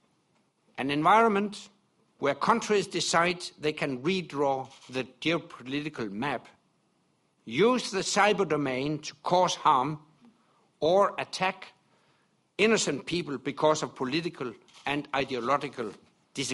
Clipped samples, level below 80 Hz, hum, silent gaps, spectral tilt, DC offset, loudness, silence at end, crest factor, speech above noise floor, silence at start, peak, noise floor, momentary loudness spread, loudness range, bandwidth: under 0.1%; -68 dBFS; none; none; -4 dB/octave; under 0.1%; -28 LUFS; 0 s; 20 dB; 43 dB; 0.75 s; -8 dBFS; -71 dBFS; 12 LU; 5 LU; 11.5 kHz